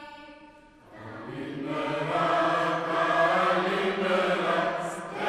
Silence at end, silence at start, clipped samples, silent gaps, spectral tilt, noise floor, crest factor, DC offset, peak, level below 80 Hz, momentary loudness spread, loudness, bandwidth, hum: 0 s; 0 s; under 0.1%; none; -5 dB/octave; -52 dBFS; 16 dB; under 0.1%; -12 dBFS; -64 dBFS; 18 LU; -26 LUFS; 13 kHz; none